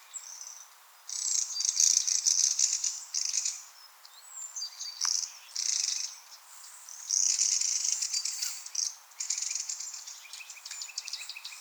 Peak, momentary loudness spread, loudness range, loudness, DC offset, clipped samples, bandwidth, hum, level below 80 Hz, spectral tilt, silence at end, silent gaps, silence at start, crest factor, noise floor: -10 dBFS; 19 LU; 7 LU; -28 LUFS; under 0.1%; under 0.1%; over 20 kHz; none; under -90 dBFS; 10.5 dB/octave; 0 s; none; 0 s; 24 dB; -54 dBFS